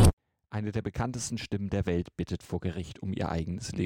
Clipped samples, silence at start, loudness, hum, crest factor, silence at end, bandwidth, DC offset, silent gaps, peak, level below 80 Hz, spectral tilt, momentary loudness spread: under 0.1%; 0 s; -33 LUFS; none; 22 dB; 0 s; 16 kHz; under 0.1%; 0.13-0.17 s; -8 dBFS; -38 dBFS; -6 dB/octave; 6 LU